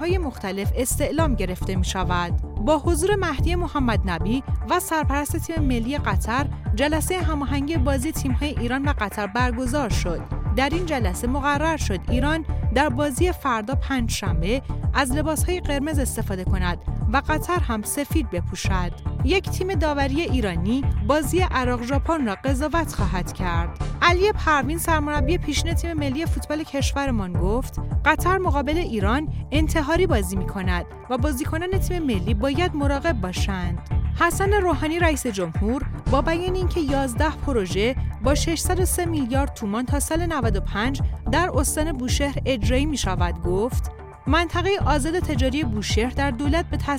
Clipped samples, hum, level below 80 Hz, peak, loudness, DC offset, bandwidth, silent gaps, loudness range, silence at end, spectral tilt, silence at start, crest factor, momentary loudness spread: under 0.1%; none; -28 dBFS; -4 dBFS; -23 LUFS; under 0.1%; 16.5 kHz; none; 2 LU; 0 s; -5.5 dB/octave; 0 s; 18 dB; 5 LU